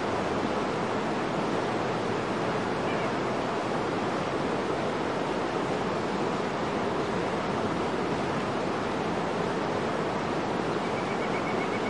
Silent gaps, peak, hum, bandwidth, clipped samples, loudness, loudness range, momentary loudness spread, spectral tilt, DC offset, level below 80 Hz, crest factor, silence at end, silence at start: none; -16 dBFS; none; 11.5 kHz; under 0.1%; -29 LUFS; 0 LU; 1 LU; -5.5 dB/octave; 0.2%; -56 dBFS; 14 dB; 0 s; 0 s